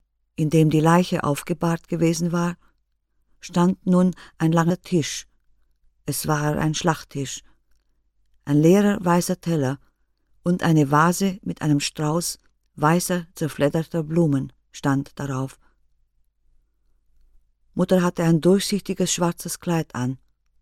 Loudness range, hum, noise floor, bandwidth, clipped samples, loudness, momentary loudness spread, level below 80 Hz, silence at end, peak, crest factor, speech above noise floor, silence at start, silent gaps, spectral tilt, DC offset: 6 LU; none; -68 dBFS; 15.5 kHz; under 0.1%; -22 LUFS; 12 LU; -52 dBFS; 0.45 s; -2 dBFS; 20 dB; 48 dB; 0.4 s; none; -6 dB/octave; under 0.1%